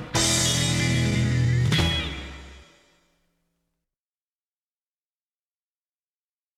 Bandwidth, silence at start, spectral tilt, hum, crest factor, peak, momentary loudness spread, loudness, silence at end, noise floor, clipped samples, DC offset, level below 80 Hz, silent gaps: 15.5 kHz; 0 s; -3.5 dB/octave; none; 16 dB; -10 dBFS; 15 LU; -22 LUFS; 3.95 s; under -90 dBFS; under 0.1%; under 0.1%; -42 dBFS; none